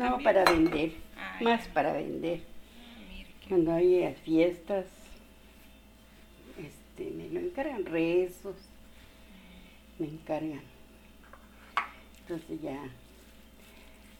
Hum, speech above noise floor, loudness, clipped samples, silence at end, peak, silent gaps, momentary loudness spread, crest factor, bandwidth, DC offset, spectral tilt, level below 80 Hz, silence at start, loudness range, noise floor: none; 26 dB; -30 LUFS; under 0.1%; 0.05 s; -6 dBFS; none; 23 LU; 26 dB; 18 kHz; under 0.1%; -6 dB/octave; -54 dBFS; 0 s; 11 LU; -55 dBFS